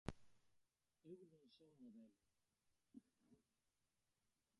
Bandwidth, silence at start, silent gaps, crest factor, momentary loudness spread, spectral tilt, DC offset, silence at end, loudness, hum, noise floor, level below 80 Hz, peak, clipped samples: 10.5 kHz; 0.05 s; none; 36 dB; 8 LU; -6.5 dB/octave; under 0.1%; 1.2 s; -64 LUFS; none; -90 dBFS; -76 dBFS; -30 dBFS; under 0.1%